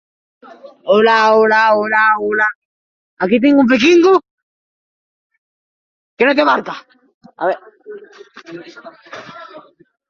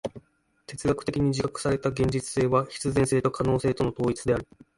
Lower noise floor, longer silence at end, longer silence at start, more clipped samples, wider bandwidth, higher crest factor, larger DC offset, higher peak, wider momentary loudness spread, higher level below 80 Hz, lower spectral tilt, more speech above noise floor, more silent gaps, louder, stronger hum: first, under -90 dBFS vs -59 dBFS; first, 0.5 s vs 0.35 s; first, 0.65 s vs 0.05 s; neither; second, 7.4 kHz vs 11.5 kHz; about the same, 14 dB vs 18 dB; neither; first, -2 dBFS vs -10 dBFS; first, 24 LU vs 4 LU; second, -62 dBFS vs -48 dBFS; about the same, -5 dB/octave vs -6 dB/octave; first, over 76 dB vs 34 dB; first, 2.55-3.17 s, 4.31-5.30 s, 5.38-6.17 s, 7.14-7.21 s vs none; first, -12 LUFS vs -26 LUFS; neither